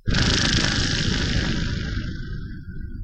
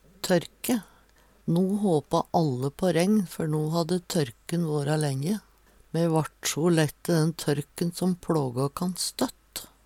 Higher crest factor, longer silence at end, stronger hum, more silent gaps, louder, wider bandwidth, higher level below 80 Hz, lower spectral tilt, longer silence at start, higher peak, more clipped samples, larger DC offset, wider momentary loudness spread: about the same, 18 dB vs 18 dB; second, 0 s vs 0.2 s; neither; neither; first, -22 LUFS vs -27 LUFS; second, 9.2 kHz vs 17 kHz; first, -28 dBFS vs -58 dBFS; second, -4 dB/octave vs -5.5 dB/octave; second, 0.05 s vs 0.25 s; first, -4 dBFS vs -8 dBFS; neither; neither; first, 16 LU vs 7 LU